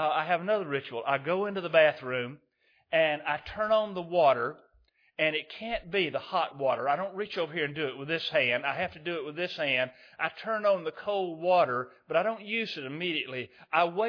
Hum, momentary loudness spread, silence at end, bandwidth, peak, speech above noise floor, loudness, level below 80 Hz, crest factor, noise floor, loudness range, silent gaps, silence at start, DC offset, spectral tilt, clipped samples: none; 9 LU; 0 s; 5.4 kHz; -8 dBFS; 37 dB; -29 LUFS; -64 dBFS; 20 dB; -67 dBFS; 2 LU; none; 0 s; under 0.1%; -6.5 dB/octave; under 0.1%